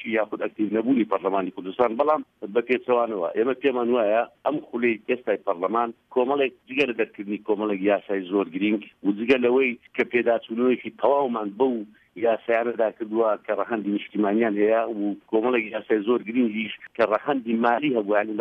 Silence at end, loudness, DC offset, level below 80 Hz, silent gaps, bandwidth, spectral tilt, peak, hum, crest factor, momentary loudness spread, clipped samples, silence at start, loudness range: 0 s; -24 LUFS; under 0.1%; -72 dBFS; none; 6 kHz; -7.5 dB/octave; -6 dBFS; none; 16 dB; 6 LU; under 0.1%; 0 s; 2 LU